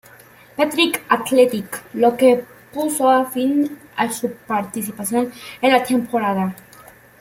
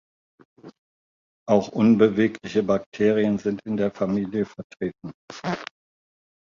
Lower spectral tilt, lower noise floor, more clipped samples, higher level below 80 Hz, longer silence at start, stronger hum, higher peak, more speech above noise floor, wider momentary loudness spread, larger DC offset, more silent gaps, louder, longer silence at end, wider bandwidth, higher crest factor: second, -4 dB/octave vs -7.5 dB/octave; second, -46 dBFS vs under -90 dBFS; neither; about the same, -62 dBFS vs -60 dBFS; about the same, 0.6 s vs 0.65 s; neither; about the same, -2 dBFS vs -4 dBFS; second, 28 dB vs over 67 dB; second, 11 LU vs 15 LU; neither; second, none vs 0.78-1.46 s, 2.86-2.92 s, 4.64-4.70 s, 5.14-5.28 s; first, -19 LUFS vs -23 LUFS; second, 0.65 s vs 0.85 s; first, 16.5 kHz vs 7.4 kHz; about the same, 18 dB vs 20 dB